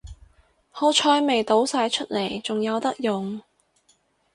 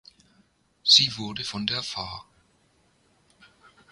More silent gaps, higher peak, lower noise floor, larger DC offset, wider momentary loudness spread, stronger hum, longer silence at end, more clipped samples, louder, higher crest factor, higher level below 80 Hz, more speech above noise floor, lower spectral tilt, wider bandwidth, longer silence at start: neither; about the same, -6 dBFS vs -4 dBFS; about the same, -64 dBFS vs -65 dBFS; neither; second, 11 LU vs 18 LU; neither; second, 0.95 s vs 1.7 s; neither; about the same, -23 LUFS vs -22 LUFS; second, 18 dB vs 26 dB; first, -54 dBFS vs -60 dBFS; about the same, 42 dB vs 40 dB; first, -3.5 dB/octave vs -1.5 dB/octave; about the same, 11.5 kHz vs 11.5 kHz; second, 0.05 s vs 0.85 s